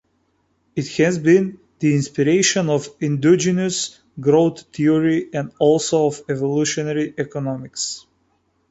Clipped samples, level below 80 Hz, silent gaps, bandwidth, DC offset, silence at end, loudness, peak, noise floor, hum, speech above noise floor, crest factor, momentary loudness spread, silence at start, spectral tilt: under 0.1%; -58 dBFS; none; 8.2 kHz; under 0.1%; 0.7 s; -19 LUFS; -4 dBFS; -65 dBFS; none; 47 dB; 16 dB; 10 LU; 0.75 s; -5 dB/octave